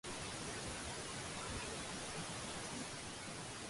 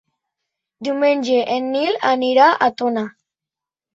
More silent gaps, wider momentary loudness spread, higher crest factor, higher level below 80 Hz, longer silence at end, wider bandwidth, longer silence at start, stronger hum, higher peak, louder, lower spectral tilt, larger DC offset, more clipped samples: neither; second, 3 LU vs 12 LU; about the same, 14 dB vs 18 dB; first, -60 dBFS vs -70 dBFS; second, 0 s vs 0.85 s; first, 11.5 kHz vs 7.8 kHz; second, 0.05 s vs 0.8 s; neither; second, -32 dBFS vs -2 dBFS; second, -45 LUFS vs -17 LUFS; second, -2.5 dB/octave vs -4.5 dB/octave; neither; neither